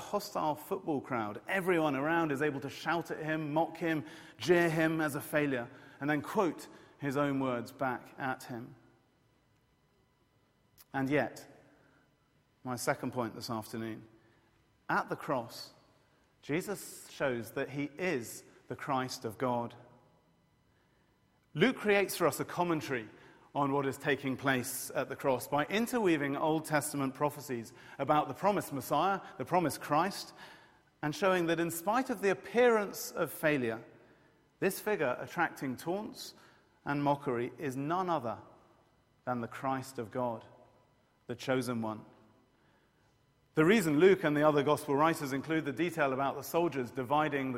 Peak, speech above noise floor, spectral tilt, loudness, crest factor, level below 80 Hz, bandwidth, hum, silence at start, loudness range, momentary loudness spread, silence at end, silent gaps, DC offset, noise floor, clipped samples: -12 dBFS; 38 dB; -5 dB/octave; -33 LUFS; 22 dB; -72 dBFS; 16 kHz; none; 0 s; 10 LU; 14 LU; 0 s; none; under 0.1%; -71 dBFS; under 0.1%